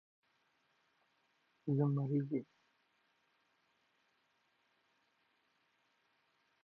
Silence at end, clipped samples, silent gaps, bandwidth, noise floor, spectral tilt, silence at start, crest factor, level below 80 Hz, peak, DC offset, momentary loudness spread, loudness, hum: 4.2 s; under 0.1%; none; 4.3 kHz; -78 dBFS; -11 dB/octave; 1.65 s; 22 dB; under -90 dBFS; -22 dBFS; under 0.1%; 8 LU; -37 LUFS; none